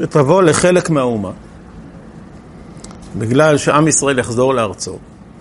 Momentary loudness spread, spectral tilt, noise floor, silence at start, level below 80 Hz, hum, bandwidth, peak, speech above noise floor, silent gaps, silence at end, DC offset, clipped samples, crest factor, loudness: 23 LU; -5 dB/octave; -36 dBFS; 0 s; -44 dBFS; none; 11.5 kHz; 0 dBFS; 22 dB; none; 0.1 s; under 0.1%; under 0.1%; 16 dB; -13 LUFS